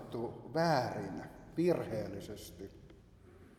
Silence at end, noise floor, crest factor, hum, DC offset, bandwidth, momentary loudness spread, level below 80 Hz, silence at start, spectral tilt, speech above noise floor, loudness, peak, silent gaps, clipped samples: 0.05 s; -59 dBFS; 20 dB; none; under 0.1%; 15.5 kHz; 16 LU; -62 dBFS; 0 s; -6.5 dB/octave; 22 dB; -36 LUFS; -18 dBFS; none; under 0.1%